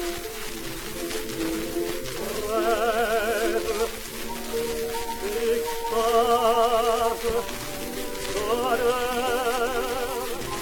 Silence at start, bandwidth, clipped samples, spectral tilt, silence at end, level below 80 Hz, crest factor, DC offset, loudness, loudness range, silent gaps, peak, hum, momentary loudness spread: 0 s; 19.5 kHz; under 0.1%; -3 dB/octave; 0 s; -42 dBFS; 16 dB; under 0.1%; -26 LUFS; 3 LU; none; -8 dBFS; none; 11 LU